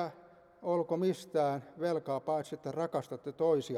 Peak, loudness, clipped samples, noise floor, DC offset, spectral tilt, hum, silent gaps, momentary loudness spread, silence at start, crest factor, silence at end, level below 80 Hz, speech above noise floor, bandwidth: -20 dBFS; -35 LUFS; under 0.1%; -58 dBFS; under 0.1%; -7 dB/octave; none; none; 9 LU; 0 s; 16 dB; 0 s; -78 dBFS; 25 dB; 13.5 kHz